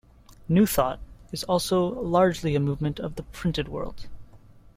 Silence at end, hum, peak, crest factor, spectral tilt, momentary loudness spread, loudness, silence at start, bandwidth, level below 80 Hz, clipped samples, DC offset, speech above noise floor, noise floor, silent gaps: 0.2 s; none; -8 dBFS; 18 dB; -6 dB/octave; 13 LU; -25 LUFS; 0.3 s; 16.5 kHz; -44 dBFS; under 0.1%; under 0.1%; 25 dB; -50 dBFS; none